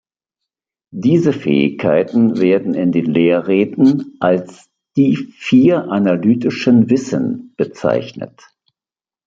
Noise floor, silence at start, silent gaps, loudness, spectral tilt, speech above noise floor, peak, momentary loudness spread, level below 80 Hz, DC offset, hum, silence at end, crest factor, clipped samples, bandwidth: under -90 dBFS; 0.95 s; none; -15 LUFS; -7.5 dB/octave; over 76 dB; 0 dBFS; 9 LU; -58 dBFS; under 0.1%; none; 1 s; 14 dB; under 0.1%; 7.6 kHz